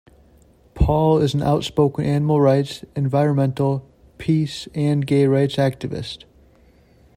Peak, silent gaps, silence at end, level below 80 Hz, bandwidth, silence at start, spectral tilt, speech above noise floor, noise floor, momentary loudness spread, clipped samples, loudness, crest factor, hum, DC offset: -4 dBFS; none; 1 s; -36 dBFS; 13.5 kHz; 0.75 s; -7.5 dB/octave; 34 dB; -53 dBFS; 12 LU; under 0.1%; -20 LUFS; 16 dB; none; under 0.1%